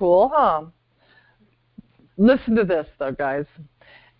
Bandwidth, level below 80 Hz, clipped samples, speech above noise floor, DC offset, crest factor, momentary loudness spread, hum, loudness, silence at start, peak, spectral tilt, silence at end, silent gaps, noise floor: 5.2 kHz; -52 dBFS; under 0.1%; 42 dB; under 0.1%; 16 dB; 13 LU; none; -20 LUFS; 0 s; -6 dBFS; -11.5 dB/octave; 0.55 s; none; -61 dBFS